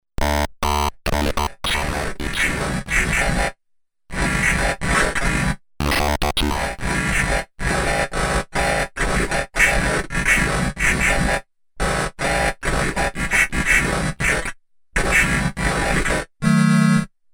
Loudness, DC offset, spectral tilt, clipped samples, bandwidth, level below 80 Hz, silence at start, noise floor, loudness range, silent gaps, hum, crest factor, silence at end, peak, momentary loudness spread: -20 LUFS; under 0.1%; -4 dB/octave; under 0.1%; over 20 kHz; -28 dBFS; 0.2 s; -63 dBFS; 2 LU; none; none; 16 dB; 0.25 s; -4 dBFS; 7 LU